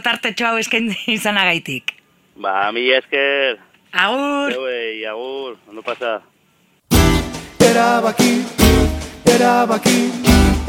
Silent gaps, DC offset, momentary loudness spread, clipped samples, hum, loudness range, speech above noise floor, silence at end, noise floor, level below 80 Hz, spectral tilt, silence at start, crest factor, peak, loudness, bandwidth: none; under 0.1%; 13 LU; under 0.1%; none; 6 LU; 40 dB; 0 s; -58 dBFS; -26 dBFS; -4.5 dB/octave; 0.05 s; 16 dB; 0 dBFS; -16 LUFS; 16.5 kHz